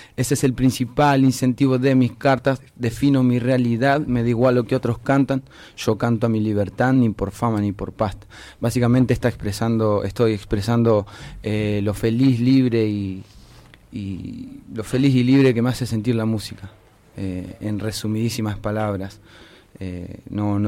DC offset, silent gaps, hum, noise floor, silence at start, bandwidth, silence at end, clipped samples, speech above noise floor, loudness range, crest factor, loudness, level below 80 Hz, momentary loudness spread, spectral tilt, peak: under 0.1%; none; none; -47 dBFS; 0 s; 16 kHz; 0 s; under 0.1%; 27 dB; 7 LU; 12 dB; -20 LUFS; -44 dBFS; 15 LU; -7 dB/octave; -8 dBFS